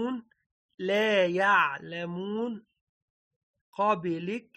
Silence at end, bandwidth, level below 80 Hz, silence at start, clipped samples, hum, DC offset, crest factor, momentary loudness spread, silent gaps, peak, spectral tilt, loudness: 0.15 s; 13 kHz; -78 dBFS; 0 s; under 0.1%; none; under 0.1%; 18 dB; 14 LU; 0.46-0.78 s, 2.81-3.54 s, 3.61-3.73 s; -12 dBFS; -5.5 dB/octave; -28 LUFS